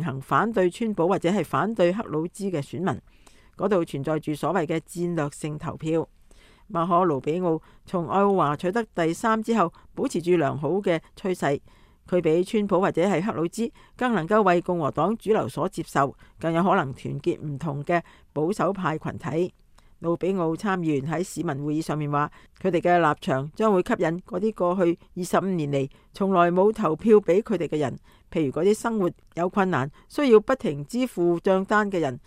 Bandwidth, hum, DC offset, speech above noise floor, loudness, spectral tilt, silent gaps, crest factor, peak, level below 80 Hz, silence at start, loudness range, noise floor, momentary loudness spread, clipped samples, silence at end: 15.5 kHz; none; under 0.1%; 29 dB; -25 LUFS; -6.5 dB/octave; none; 20 dB; -4 dBFS; -56 dBFS; 0 s; 5 LU; -53 dBFS; 9 LU; under 0.1%; 0.1 s